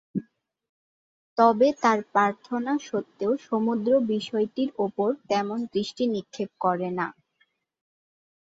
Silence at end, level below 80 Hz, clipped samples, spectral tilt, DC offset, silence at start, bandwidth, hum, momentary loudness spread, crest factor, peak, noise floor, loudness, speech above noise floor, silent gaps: 1.45 s; -72 dBFS; under 0.1%; -6 dB/octave; under 0.1%; 0.15 s; 7.8 kHz; none; 10 LU; 20 dB; -6 dBFS; -70 dBFS; -26 LUFS; 45 dB; 0.69-1.36 s